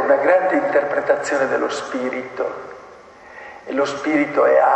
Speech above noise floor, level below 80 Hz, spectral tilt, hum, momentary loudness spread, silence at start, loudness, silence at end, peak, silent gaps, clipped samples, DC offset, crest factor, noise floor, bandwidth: 24 dB; -62 dBFS; -4.5 dB/octave; none; 21 LU; 0 s; -19 LUFS; 0 s; -4 dBFS; none; under 0.1%; under 0.1%; 16 dB; -42 dBFS; 8.8 kHz